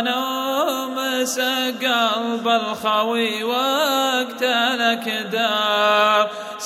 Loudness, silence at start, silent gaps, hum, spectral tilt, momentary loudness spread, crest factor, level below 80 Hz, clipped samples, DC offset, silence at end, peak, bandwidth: -19 LUFS; 0 s; none; none; -2 dB/octave; 6 LU; 16 dB; -72 dBFS; under 0.1%; under 0.1%; 0 s; -4 dBFS; 16.5 kHz